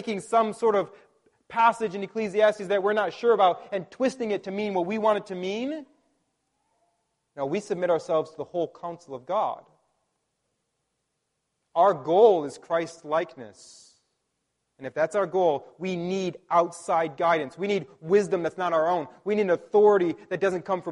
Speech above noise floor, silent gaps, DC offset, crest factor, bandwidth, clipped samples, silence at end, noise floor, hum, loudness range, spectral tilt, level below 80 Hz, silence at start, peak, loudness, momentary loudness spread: 54 dB; none; under 0.1%; 20 dB; 11.5 kHz; under 0.1%; 0 s; -79 dBFS; none; 7 LU; -5.5 dB/octave; -72 dBFS; 0 s; -6 dBFS; -25 LUFS; 12 LU